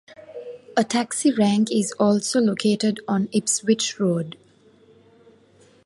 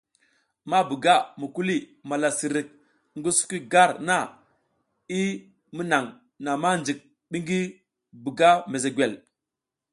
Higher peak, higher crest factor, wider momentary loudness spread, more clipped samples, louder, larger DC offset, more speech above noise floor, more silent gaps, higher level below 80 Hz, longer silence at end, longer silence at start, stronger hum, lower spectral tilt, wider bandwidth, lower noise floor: about the same, -6 dBFS vs -4 dBFS; about the same, 18 dB vs 22 dB; about the same, 14 LU vs 16 LU; neither; first, -21 LUFS vs -24 LUFS; neither; second, 34 dB vs 63 dB; neither; about the same, -68 dBFS vs -70 dBFS; first, 1.55 s vs 0.75 s; second, 0.1 s vs 0.65 s; neither; about the same, -4.5 dB/octave vs -3.5 dB/octave; about the same, 11.5 kHz vs 11.5 kHz; second, -55 dBFS vs -87 dBFS